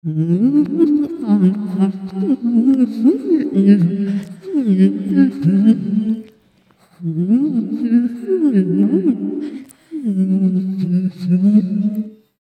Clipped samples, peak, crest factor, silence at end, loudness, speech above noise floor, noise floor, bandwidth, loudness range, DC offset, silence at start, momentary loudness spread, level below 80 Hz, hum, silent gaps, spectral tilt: under 0.1%; 0 dBFS; 16 dB; 0.3 s; -16 LUFS; 39 dB; -54 dBFS; 9 kHz; 3 LU; under 0.1%; 0.05 s; 10 LU; -64 dBFS; none; none; -10 dB/octave